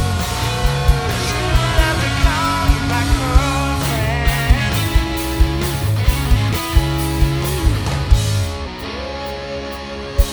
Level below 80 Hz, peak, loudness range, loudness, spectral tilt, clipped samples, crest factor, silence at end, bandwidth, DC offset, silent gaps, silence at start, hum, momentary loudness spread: -20 dBFS; 0 dBFS; 3 LU; -18 LUFS; -5 dB/octave; under 0.1%; 16 dB; 0 s; over 20 kHz; under 0.1%; none; 0 s; none; 9 LU